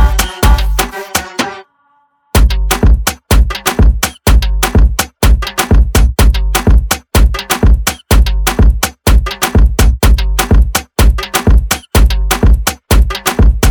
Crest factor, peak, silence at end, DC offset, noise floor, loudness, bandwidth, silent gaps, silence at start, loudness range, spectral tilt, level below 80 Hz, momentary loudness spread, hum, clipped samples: 10 dB; 0 dBFS; 0 s; under 0.1%; -54 dBFS; -12 LUFS; over 20 kHz; none; 0 s; 2 LU; -4.5 dB/octave; -10 dBFS; 3 LU; none; under 0.1%